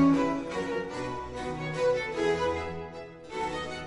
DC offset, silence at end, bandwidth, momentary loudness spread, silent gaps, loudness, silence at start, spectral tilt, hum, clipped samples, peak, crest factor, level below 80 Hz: under 0.1%; 0 s; 10.5 kHz; 11 LU; none; -31 LUFS; 0 s; -6 dB/octave; none; under 0.1%; -14 dBFS; 16 dB; -52 dBFS